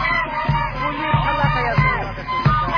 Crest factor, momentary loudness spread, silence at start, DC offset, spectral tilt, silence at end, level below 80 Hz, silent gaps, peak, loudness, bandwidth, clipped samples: 16 dB; 5 LU; 0 s; under 0.1%; -7.5 dB/octave; 0 s; -30 dBFS; none; -4 dBFS; -19 LUFS; 5.4 kHz; under 0.1%